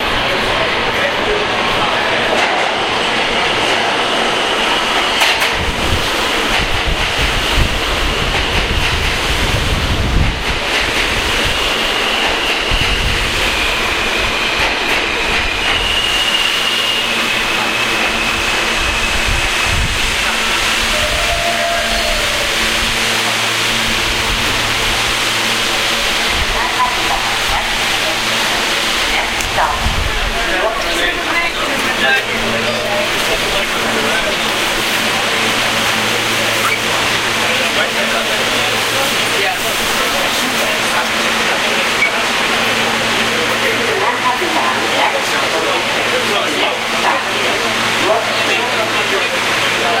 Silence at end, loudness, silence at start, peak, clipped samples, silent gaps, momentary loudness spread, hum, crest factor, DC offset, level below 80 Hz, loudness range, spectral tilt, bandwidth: 0 s; -13 LUFS; 0 s; 0 dBFS; under 0.1%; none; 2 LU; none; 14 dB; under 0.1%; -28 dBFS; 1 LU; -2 dB/octave; 16 kHz